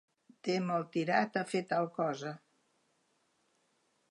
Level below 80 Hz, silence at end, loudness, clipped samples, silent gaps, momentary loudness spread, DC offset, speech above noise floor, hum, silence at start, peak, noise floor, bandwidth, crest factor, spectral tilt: -88 dBFS; 1.75 s; -34 LUFS; under 0.1%; none; 11 LU; under 0.1%; 42 dB; none; 0.45 s; -16 dBFS; -76 dBFS; 11 kHz; 20 dB; -6 dB/octave